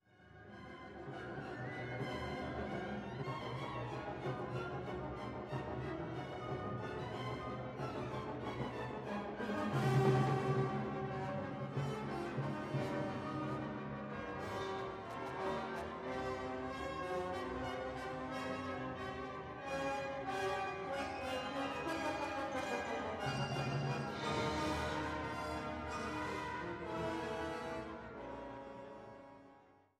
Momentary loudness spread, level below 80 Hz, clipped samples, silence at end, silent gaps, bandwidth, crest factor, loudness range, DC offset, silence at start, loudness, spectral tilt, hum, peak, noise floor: 8 LU; -60 dBFS; under 0.1%; 0.3 s; none; 13.5 kHz; 20 dB; 6 LU; under 0.1%; 0.15 s; -41 LUFS; -6 dB/octave; none; -20 dBFS; -65 dBFS